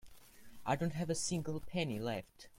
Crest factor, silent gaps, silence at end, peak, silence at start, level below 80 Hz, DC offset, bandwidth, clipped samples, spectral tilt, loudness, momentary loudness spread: 18 dB; none; 0 s; -20 dBFS; 0.05 s; -62 dBFS; under 0.1%; 16.5 kHz; under 0.1%; -4.5 dB/octave; -39 LUFS; 6 LU